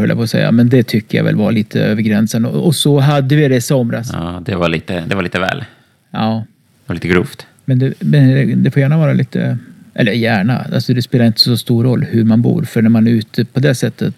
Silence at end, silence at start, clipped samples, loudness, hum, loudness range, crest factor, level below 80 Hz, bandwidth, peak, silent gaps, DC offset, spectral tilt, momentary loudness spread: 0.05 s; 0 s; under 0.1%; -13 LUFS; none; 5 LU; 12 dB; -48 dBFS; 14.5 kHz; 0 dBFS; none; under 0.1%; -6.5 dB/octave; 9 LU